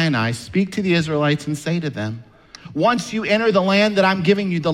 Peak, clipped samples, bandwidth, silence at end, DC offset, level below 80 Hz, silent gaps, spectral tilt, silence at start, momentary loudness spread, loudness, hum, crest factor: -4 dBFS; under 0.1%; 13 kHz; 0 s; under 0.1%; -54 dBFS; none; -6 dB/octave; 0 s; 10 LU; -19 LUFS; none; 16 dB